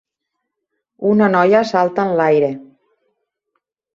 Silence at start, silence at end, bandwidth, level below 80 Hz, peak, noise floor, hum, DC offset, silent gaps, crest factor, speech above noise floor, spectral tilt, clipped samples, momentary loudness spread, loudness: 1 s; 1.3 s; 7.6 kHz; -64 dBFS; 0 dBFS; -77 dBFS; none; under 0.1%; none; 16 dB; 63 dB; -7 dB/octave; under 0.1%; 9 LU; -15 LUFS